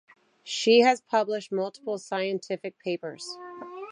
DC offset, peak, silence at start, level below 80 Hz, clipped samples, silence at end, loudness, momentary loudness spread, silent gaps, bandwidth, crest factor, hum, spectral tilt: under 0.1%; -8 dBFS; 0.45 s; -84 dBFS; under 0.1%; 0 s; -26 LUFS; 19 LU; none; 10.5 kHz; 20 dB; none; -3.5 dB/octave